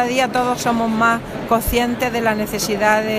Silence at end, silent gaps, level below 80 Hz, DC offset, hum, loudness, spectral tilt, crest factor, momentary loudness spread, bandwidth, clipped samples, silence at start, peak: 0 s; none; -36 dBFS; under 0.1%; none; -18 LUFS; -4 dB/octave; 18 dB; 4 LU; 15.5 kHz; under 0.1%; 0 s; 0 dBFS